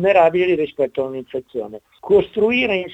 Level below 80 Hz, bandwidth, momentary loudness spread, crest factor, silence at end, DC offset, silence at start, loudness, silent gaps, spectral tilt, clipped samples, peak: -52 dBFS; 7.8 kHz; 15 LU; 16 dB; 0 s; under 0.1%; 0 s; -18 LUFS; none; -7 dB/octave; under 0.1%; -2 dBFS